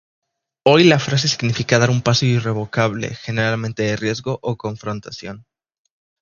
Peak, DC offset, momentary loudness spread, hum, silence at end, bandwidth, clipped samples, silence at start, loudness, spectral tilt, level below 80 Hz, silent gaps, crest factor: 0 dBFS; under 0.1%; 15 LU; none; 0.8 s; 7.2 kHz; under 0.1%; 0.65 s; -18 LUFS; -5 dB/octave; -52 dBFS; none; 18 dB